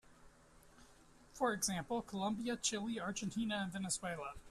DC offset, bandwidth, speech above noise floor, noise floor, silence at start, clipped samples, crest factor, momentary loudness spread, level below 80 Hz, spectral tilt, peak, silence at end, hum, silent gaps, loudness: under 0.1%; 14 kHz; 24 dB; -64 dBFS; 0.1 s; under 0.1%; 20 dB; 5 LU; -66 dBFS; -3.5 dB/octave; -22 dBFS; 0 s; none; none; -40 LUFS